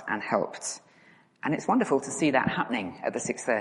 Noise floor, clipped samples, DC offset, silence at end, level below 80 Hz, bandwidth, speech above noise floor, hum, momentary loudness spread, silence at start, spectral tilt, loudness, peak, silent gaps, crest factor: -59 dBFS; under 0.1%; under 0.1%; 0 s; -68 dBFS; 11.5 kHz; 31 dB; none; 11 LU; 0 s; -4.5 dB/octave; -28 LUFS; -8 dBFS; none; 22 dB